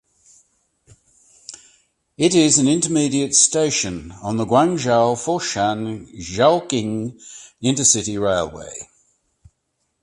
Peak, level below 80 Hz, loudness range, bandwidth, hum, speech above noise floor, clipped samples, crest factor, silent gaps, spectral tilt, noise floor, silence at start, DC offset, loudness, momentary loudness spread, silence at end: 0 dBFS; -52 dBFS; 4 LU; 11.5 kHz; none; 53 dB; under 0.1%; 20 dB; none; -3.5 dB/octave; -72 dBFS; 1.5 s; under 0.1%; -18 LUFS; 19 LU; 1.2 s